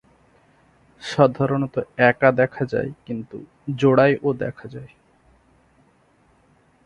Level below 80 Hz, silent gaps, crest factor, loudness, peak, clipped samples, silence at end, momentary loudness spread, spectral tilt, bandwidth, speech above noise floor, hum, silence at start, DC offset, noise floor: -56 dBFS; none; 22 dB; -20 LUFS; -2 dBFS; under 0.1%; 2 s; 20 LU; -7.5 dB/octave; 10.5 kHz; 39 dB; none; 1 s; under 0.1%; -59 dBFS